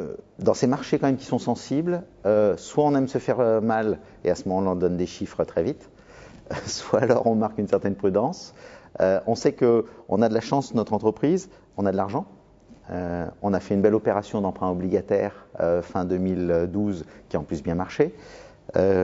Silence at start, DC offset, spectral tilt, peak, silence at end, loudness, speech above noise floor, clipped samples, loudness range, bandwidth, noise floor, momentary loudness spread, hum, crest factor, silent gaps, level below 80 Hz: 0 s; under 0.1%; -7 dB/octave; -4 dBFS; 0 s; -24 LUFS; 28 dB; under 0.1%; 3 LU; 7.8 kHz; -51 dBFS; 9 LU; none; 20 dB; none; -54 dBFS